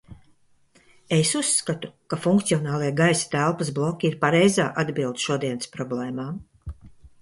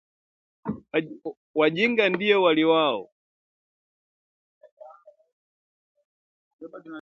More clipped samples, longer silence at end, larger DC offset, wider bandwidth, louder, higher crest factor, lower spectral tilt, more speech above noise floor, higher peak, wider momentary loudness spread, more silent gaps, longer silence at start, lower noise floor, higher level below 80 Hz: neither; first, 0.15 s vs 0 s; neither; first, 11.5 kHz vs 7 kHz; about the same, -23 LUFS vs -22 LUFS; about the same, 18 dB vs 20 dB; second, -4.5 dB/octave vs -6.5 dB/octave; first, 36 dB vs 28 dB; about the same, -6 dBFS vs -6 dBFS; second, 12 LU vs 19 LU; second, none vs 1.37-1.54 s, 3.12-4.61 s, 4.72-4.77 s, 5.32-5.95 s, 6.05-6.59 s; second, 0.1 s vs 0.65 s; first, -59 dBFS vs -51 dBFS; first, -52 dBFS vs -68 dBFS